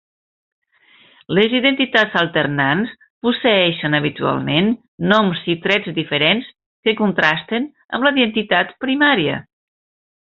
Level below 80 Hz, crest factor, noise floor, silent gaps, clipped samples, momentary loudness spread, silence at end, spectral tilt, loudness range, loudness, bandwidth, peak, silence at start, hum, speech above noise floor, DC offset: -58 dBFS; 16 dB; -52 dBFS; 3.10-3.21 s, 4.88-4.98 s, 6.66-6.83 s; under 0.1%; 8 LU; 0.8 s; -2.5 dB/octave; 1 LU; -17 LUFS; 7.2 kHz; -2 dBFS; 1.3 s; none; 35 dB; under 0.1%